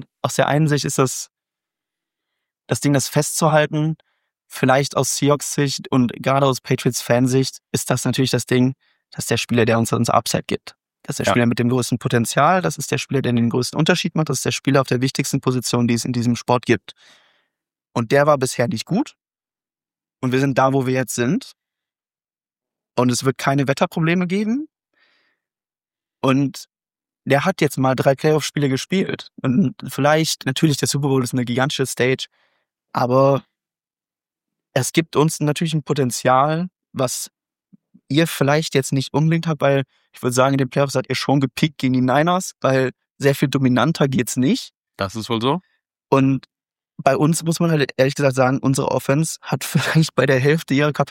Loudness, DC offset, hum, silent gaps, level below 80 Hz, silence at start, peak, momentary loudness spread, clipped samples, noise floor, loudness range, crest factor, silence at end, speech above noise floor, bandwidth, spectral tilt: -19 LUFS; under 0.1%; none; none; -58 dBFS; 0 s; -2 dBFS; 8 LU; under 0.1%; under -90 dBFS; 3 LU; 18 dB; 0 s; over 72 dB; 17 kHz; -5 dB/octave